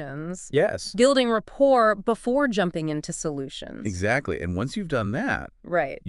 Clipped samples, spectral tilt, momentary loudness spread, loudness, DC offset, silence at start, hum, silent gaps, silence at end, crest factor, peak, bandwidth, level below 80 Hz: under 0.1%; -5 dB/octave; 12 LU; -24 LUFS; under 0.1%; 0 s; none; none; 0 s; 18 dB; -6 dBFS; 12 kHz; -48 dBFS